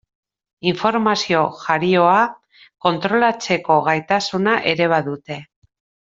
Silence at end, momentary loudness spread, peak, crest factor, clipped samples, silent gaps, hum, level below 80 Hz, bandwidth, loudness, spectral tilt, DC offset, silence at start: 0.7 s; 8 LU; -2 dBFS; 18 dB; under 0.1%; none; none; -62 dBFS; 7.8 kHz; -18 LUFS; -5 dB/octave; under 0.1%; 0.65 s